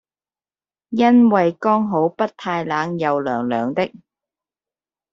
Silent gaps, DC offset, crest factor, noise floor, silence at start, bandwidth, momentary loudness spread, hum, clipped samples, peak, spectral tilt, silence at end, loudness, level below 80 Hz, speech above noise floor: none; under 0.1%; 18 dB; under -90 dBFS; 0.9 s; 6.6 kHz; 11 LU; none; under 0.1%; -2 dBFS; -7.5 dB/octave; 1.25 s; -19 LUFS; -64 dBFS; over 72 dB